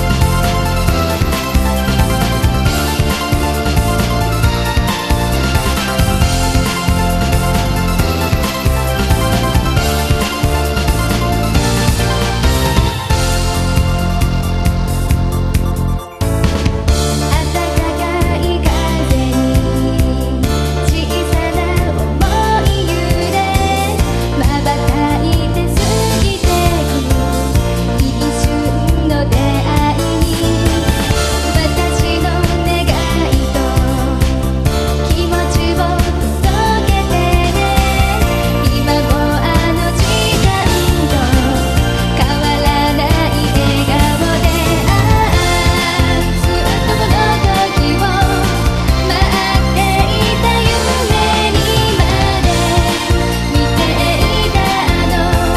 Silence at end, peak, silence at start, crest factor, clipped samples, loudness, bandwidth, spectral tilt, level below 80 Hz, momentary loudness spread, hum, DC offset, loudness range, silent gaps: 0 s; 0 dBFS; 0 s; 12 dB; under 0.1%; -14 LUFS; 14 kHz; -5 dB/octave; -18 dBFS; 3 LU; none; under 0.1%; 2 LU; none